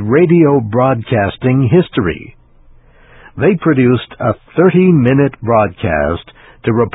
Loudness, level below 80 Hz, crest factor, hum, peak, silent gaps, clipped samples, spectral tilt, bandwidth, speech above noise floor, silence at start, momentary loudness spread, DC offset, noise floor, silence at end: -12 LUFS; -36 dBFS; 12 dB; none; 0 dBFS; none; under 0.1%; -12 dB/octave; 4 kHz; 31 dB; 0 s; 9 LU; under 0.1%; -43 dBFS; 0.05 s